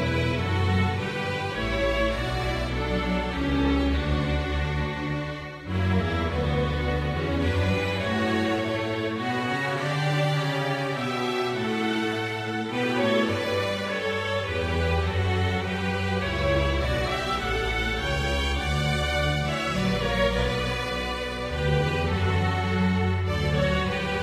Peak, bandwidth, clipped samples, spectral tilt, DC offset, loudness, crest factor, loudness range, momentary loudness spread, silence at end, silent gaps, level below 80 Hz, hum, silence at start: -12 dBFS; 15 kHz; under 0.1%; -6 dB/octave; under 0.1%; -26 LUFS; 14 dB; 1 LU; 4 LU; 0 s; none; -34 dBFS; none; 0 s